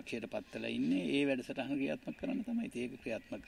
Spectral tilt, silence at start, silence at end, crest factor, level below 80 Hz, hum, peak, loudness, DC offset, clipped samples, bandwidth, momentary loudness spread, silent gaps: -6 dB/octave; 0 s; 0 s; 16 dB; -68 dBFS; none; -20 dBFS; -38 LUFS; under 0.1%; under 0.1%; 12.5 kHz; 9 LU; none